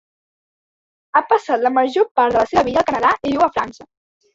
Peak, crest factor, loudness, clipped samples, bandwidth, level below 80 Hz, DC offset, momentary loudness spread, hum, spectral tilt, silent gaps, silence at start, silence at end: -2 dBFS; 16 dB; -17 LUFS; under 0.1%; 7.8 kHz; -52 dBFS; under 0.1%; 4 LU; none; -5 dB/octave; 2.11-2.15 s; 1.15 s; 0.5 s